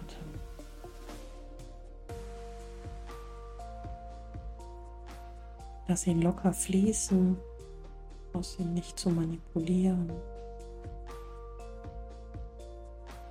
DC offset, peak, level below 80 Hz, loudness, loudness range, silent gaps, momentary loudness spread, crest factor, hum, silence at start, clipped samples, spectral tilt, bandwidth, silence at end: under 0.1%; -16 dBFS; -46 dBFS; -32 LUFS; 15 LU; none; 21 LU; 20 dB; none; 0 s; under 0.1%; -6 dB/octave; 16 kHz; 0 s